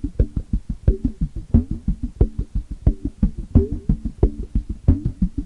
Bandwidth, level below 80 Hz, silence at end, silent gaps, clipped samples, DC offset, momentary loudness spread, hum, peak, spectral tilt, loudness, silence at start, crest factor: 2.7 kHz; -24 dBFS; 0 s; none; under 0.1%; under 0.1%; 8 LU; none; -2 dBFS; -11 dB/octave; -23 LUFS; 0 s; 18 dB